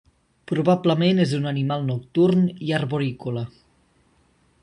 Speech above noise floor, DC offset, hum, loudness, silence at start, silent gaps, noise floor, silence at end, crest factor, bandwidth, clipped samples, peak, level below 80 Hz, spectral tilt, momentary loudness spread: 40 dB; under 0.1%; none; -22 LUFS; 0.5 s; none; -61 dBFS; 1.15 s; 18 dB; 10.5 kHz; under 0.1%; -6 dBFS; -60 dBFS; -7.5 dB/octave; 10 LU